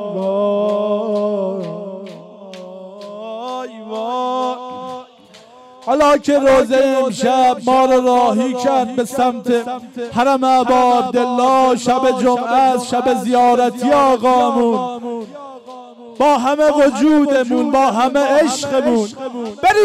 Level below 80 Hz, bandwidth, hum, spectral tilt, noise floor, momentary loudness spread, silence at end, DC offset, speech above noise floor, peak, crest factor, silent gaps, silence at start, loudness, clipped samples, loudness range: -52 dBFS; 15 kHz; none; -4.5 dB/octave; -43 dBFS; 17 LU; 0 s; under 0.1%; 30 dB; -6 dBFS; 8 dB; none; 0 s; -15 LUFS; under 0.1%; 11 LU